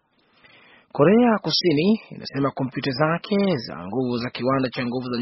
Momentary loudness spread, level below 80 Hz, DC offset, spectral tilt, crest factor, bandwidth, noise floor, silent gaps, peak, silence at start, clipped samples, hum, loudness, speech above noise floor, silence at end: 9 LU; -60 dBFS; under 0.1%; -5 dB/octave; 18 dB; 6 kHz; -57 dBFS; none; -4 dBFS; 0.95 s; under 0.1%; none; -22 LUFS; 36 dB; 0 s